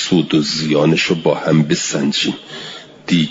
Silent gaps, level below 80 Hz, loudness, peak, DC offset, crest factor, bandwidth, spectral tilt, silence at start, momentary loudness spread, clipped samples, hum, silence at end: none; -54 dBFS; -15 LUFS; -2 dBFS; under 0.1%; 14 dB; 7.8 kHz; -4.5 dB/octave; 0 s; 15 LU; under 0.1%; none; 0 s